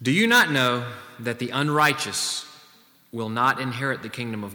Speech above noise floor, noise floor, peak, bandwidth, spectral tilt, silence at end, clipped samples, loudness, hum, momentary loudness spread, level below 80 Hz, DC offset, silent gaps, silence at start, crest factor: 32 dB; -55 dBFS; -6 dBFS; over 20 kHz; -3.5 dB/octave; 0 s; under 0.1%; -23 LUFS; none; 16 LU; -70 dBFS; under 0.1%; none; 0 s; 18 dB